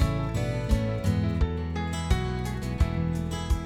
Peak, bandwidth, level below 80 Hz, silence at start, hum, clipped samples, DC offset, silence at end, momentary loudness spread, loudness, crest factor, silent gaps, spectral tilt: -10 dBFS; 15.5 kHz; -32 dBFS; 0 s; none; under 0.1%; under 0.1%; 0 s; 4 LU; -28 LUFS; 18 dB; none; -6.5 dB/octave